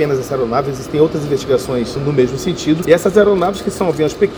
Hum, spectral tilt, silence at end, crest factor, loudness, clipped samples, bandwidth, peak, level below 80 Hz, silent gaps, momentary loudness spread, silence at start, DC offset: none; -6 dB/octave; 0 s; 14 dB; -15 LUFS; under 0.1%; over 20 kHz; 0 dBFS; -40 dBFS; none; 7 LU; 0 s; under 0.1%